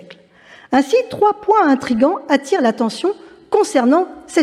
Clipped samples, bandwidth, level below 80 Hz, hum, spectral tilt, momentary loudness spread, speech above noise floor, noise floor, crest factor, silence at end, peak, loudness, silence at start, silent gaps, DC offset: under 0.1%; 13.5 kHz; -58 dBFS; none; -4.5 dB/octave; 6 LU; 30 dB; -45 dBFS; 14 dB; 0 s; -2 dBFS; -16 LUFS; 0.1 s; none; under 0.1%